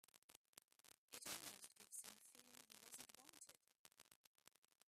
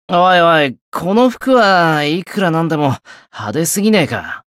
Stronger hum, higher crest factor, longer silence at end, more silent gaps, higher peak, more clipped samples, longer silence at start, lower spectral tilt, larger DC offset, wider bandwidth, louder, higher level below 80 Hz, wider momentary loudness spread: neither; first, 26 dB vs 12 dB; about the same, 0.1 s vs 0.2 s; first, 0.18-0.29 s, 0.37-0.53 s, 0.64-0.68 s, 0.98-1.08 s, 3.79-3.85 s, 4.16-4.35 s, 4.58-4.62 s vs 0.81-0.92 s; second, -36 dBFS vs -2 dBFS; neither; about the same, 0.15 s vs 0.1 s; second, 0 dB/octave vs -4.5 dB/octave; neither; about the same, 15.5 kHz vs 16 kHz; second, -58 LUFS vs -13 LUFS; second, under -90 dBFS vs -56 dBFS; first, 16 LU vs 12 LU